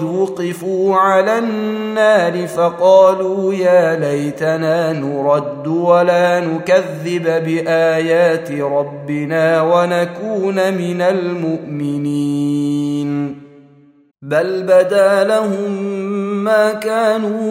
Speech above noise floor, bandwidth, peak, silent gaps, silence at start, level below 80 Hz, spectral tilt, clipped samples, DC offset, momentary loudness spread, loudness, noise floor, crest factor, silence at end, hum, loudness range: 32 dB; 16 kHz; 0 dBFS; none; 0 s; -66 dBFS; -6.5 dB/octave; under 0.1%; under 0.1%; 8 LU; -15 LUFS; -47 dBFS; 14 dB; 0 s; none; 4 LU